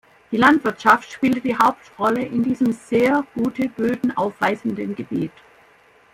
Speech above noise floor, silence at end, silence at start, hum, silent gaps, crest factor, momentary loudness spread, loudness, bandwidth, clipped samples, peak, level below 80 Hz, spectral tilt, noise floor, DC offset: 33 dB; 0.85 s; 0.3 s; none; none; 18 dB; 10 LU; -20 LUFS; 16.5 kHz; under 0.1%; -2 dBFS; -58 dBFS; -6 dB/octave; -53 dBFS; under 0.1%